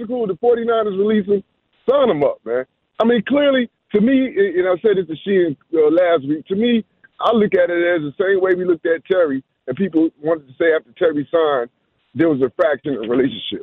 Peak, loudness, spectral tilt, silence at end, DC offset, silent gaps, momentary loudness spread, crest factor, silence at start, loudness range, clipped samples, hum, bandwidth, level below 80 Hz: -4 dBFS; -18 LUFS; -9 dB/octave; 0 s; under 0.1%; none; 7 LU; 12 dB; 0 s; 2 LU; under 0.1%; none; 4.2 kHz; -58 dBFS